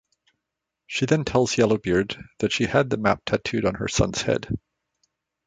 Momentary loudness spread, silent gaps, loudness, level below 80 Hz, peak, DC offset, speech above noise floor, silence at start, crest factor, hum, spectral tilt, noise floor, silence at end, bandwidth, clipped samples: 8 LU; none; -23 LUFS; -44 dBFS; -4 dBFS; under 0.1%; 61 dB; 0.9 s; 20 dB; none; -5 dB/octave; -83 dBFS; 0.9 s; 9.6 kHz; under 0.1%